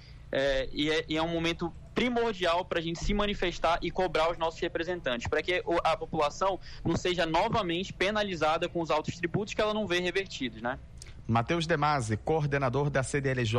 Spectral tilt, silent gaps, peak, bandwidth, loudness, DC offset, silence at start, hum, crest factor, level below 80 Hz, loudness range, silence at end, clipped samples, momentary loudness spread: -5 dB/octave; none; -16 dBFS; 12 kHz; -30 LUFS; under 0.1%; 0 s; none; 12 dB; -46 dBFS; 1 LU; 0 s; under 0.1%; 5 LU